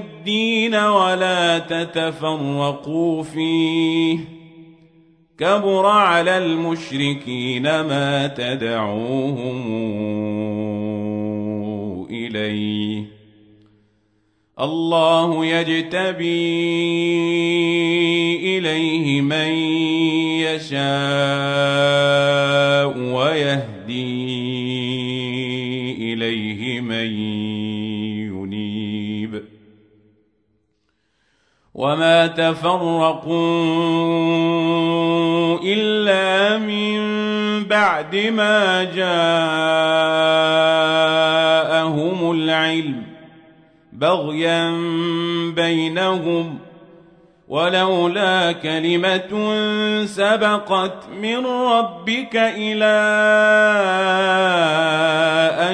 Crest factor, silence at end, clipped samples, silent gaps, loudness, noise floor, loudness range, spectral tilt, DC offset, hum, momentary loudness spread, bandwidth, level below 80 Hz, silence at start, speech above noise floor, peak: 16 dB; 0 s; under 0.1%; none; -18 LUFS; -68 dBFS; 8 LU; -5.5 dB/octave; under 0.1%; none; 9 LU; 9.8 kHz; -64 dBFS; 0 s; 50 dB; -2 dBFS